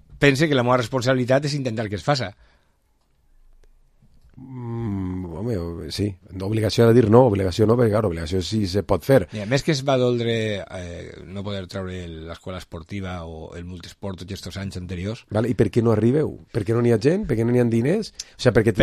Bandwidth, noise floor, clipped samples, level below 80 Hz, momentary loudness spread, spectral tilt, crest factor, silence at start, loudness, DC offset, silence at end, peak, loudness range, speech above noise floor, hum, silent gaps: 14.5 kHz; -63 dBFS; under 0.1%; -42 dBFS; 16 LU; -6.5 dB/octave; 20 dB; 0.1 s; -21 LUFS; under 0.1%; 0 s; 0 dBFS; 14 LU; 42 dB; none; none